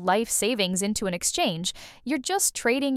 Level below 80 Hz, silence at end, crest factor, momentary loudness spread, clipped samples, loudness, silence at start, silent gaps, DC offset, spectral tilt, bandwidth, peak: -54 dBFS; 0 s; 16 dB; 8 LU; under 0.1%; -25 LUFS; 0 s; none; under 0.1%; -2.5 dB/octave; 16.5 kHz; -10 dBFS